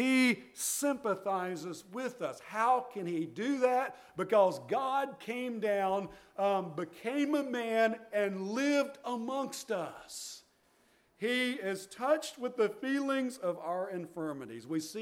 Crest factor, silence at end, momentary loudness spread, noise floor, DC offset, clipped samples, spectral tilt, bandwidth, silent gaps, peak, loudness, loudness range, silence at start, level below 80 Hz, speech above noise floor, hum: 18 dB; 0 s; 10 LU; -69 dBFS; under 0.1%; under 0.1%; -4 dB/octave; 17 kHz; none; -14 dBFS; -34 LUFS; 4 LU; 0 s; -78 dBFS; 35 dB; none